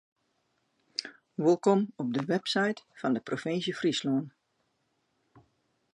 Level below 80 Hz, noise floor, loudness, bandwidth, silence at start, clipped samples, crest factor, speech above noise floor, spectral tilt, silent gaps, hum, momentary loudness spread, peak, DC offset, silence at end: -80 dBFS; -76 dBFS; -30 LUFS; 11.5 kHz; 1 s; under 0.1%; 20 dB; 48 dB; -5.5 dB/octave; none; none; 12 LU; -12 dBFS; under 0.1%; 1.65 s